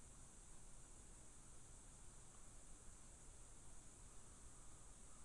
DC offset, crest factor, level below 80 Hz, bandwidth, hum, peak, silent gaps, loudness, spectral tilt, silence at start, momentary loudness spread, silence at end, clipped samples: under 0.1%; 14 dB; -64 dBFS; 11.5 kHz; none; -46 dBFS; none; -63 LUFS; -3 dB/octave; 0 s; 0 LU; 0 s; under 0.1%